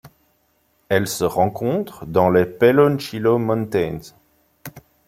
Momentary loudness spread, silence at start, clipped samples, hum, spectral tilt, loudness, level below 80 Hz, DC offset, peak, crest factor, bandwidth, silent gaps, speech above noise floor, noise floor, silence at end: 20 LU; 0.05 s; under 0.1%; none; -6 dB/octave; -19 LUFS; -54 dBFS; under 0.1%; 0 dBFS; 20 dB; 16.5 kHz; none; 45 dB; -64 dBFS; 0.3 s